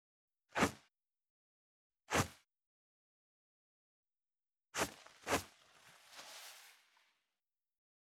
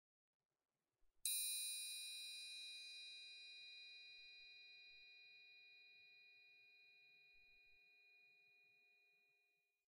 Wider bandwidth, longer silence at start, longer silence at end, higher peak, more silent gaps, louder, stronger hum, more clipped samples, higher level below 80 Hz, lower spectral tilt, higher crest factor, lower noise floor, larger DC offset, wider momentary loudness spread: first, 19 kHz vs 16 kHz; second, 0.55 s vs 1.05 s; first, 1.45 s vs 0.75 s; first, -20 dBFS vs -28 dBFS; first, 1.30-1.90 s, 2.66-4.03 s vs none; first, -40 LUFS vs -49 LUFS; neither; neither; first, -72 dBFS vs under -90 dBFS; first, -3.5 dB/octave vs 5.5 dB/octave; about the same, 26 dB vs 30 dB; first, under -90 dBFS vs -85 dBFS; neither; second, 20 LU vs 25 LU